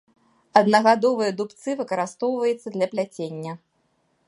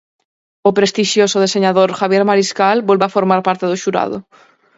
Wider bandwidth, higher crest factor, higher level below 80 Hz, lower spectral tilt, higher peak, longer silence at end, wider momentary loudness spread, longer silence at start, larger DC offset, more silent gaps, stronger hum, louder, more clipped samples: first, 11.5 kHz vs 8 kHz; first, 22 dB vs 14 dB; second, -76 dBFS vs -62 dBFS; about the same, -5 dB/octave vs -4.5 dB/octave; about the same, 0 dBFS vs 0 dBFS; first, 0.7 s vs 0.55 s; first, 15 LU vs 5 LU; about the same, 0.55 s vs 0.65 s; neither; neither; neither; second, -22 LUFS vs -14 LUFS; neither